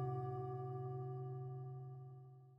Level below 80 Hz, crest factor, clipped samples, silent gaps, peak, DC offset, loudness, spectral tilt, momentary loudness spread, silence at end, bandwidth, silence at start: -78 dBFS; 14 dB; under 0.1%; none; -34 dBFS; under 0.1%; -48 LUFS; -11.5 dB/octave; 11 LU; 0 s; 3.1 kHz; 0 s